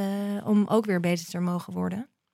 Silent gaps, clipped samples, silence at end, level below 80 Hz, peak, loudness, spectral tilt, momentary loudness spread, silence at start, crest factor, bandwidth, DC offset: none; under 0.1%; 0.3 s; -74 dBFS; -10 dBFS; -27 LUFS; -6.5 dB/octave; 9 LU; 0 s; 16 dB; 15.5 kHz; under 0.1%